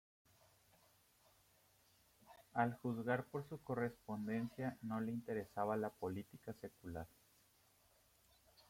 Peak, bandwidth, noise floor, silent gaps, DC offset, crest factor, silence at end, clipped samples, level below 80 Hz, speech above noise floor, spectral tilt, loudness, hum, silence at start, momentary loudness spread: -22 dBFS; 16.5 kHz; -74 dBFS; none; under 0.1%; 24 dB; 0.1 s; under 0.1%; -76 dBFS; 30 dB; -7.5 dB/octave; -44 LUFS; none; 2.25 s; 12 LU